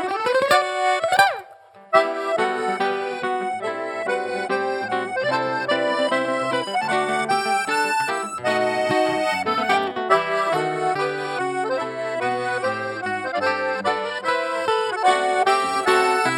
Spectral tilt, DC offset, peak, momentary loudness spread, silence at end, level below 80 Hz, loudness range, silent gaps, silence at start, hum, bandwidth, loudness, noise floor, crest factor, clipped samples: -3.5 dB/octave; under 0.1%; -2 dBFS; 7 LU; 0 s; -74 dBFS; 3 LU; none; 0 s; none; 18 kHz; -21 LUFS; -46 dBFS; 20 dB; under 0.1%